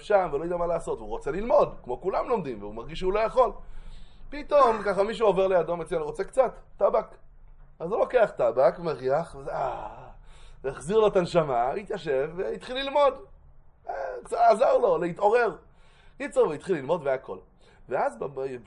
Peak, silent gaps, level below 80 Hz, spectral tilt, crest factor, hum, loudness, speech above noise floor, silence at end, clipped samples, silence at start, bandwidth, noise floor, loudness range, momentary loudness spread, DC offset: -8 dBFS; none; -48 dBFS; -6 dB/octave; 18 dB; none; -26 LUFS; 27 dB; 0.05 s; under 0.1%; 0 s; 11 kHz; -53 dBFS; 3 LU; 14 LU; under 0.1%